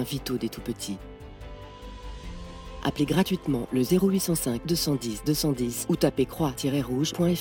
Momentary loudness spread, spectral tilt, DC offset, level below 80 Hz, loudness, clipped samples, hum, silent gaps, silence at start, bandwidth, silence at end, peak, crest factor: 18 LU; -5.5 dB/octave; under 0.1%; -46 dBFS; -27 LUFS; under 0.1%; none; none; 0 s; 18 kHz; 0 s; -8 dBFS; 18 dB